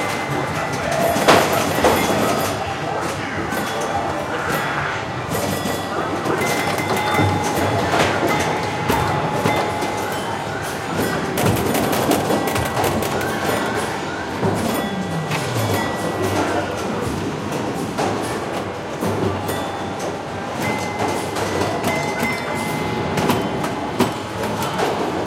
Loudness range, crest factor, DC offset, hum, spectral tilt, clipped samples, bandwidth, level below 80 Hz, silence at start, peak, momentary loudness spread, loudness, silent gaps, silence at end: 4 LU; 20 dB; under 0.1%; none; -4.5 dB/octave; under 0.1%; 17 kHz; -44 dBFS; 0 s; 0 dBFS; 6 LU; -21 LUFS; none; 0 s